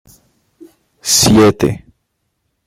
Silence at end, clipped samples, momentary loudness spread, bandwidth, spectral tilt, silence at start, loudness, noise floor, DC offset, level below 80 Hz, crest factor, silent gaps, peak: 0.9 s; under 0.1%; 16 LU; 16.5 kHz; -4 dB/octave; 1.05 s; -11 LUFS; -68 dBFS; under 0.1%; -38 dBFS; 16 dB; none; 0 dBFS